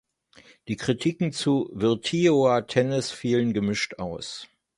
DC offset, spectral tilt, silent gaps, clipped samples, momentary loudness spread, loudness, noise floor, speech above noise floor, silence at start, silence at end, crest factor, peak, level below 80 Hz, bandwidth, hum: under 0.1%; -5.5 dB/octave; none; under 0.1%; 12 LU; -25 LUFS; -55 dBFS; 31 dB; 0.65 s; 0.35 s; 20 dB; -6 dBFS; -58 dBFS; 11.5 kHz; none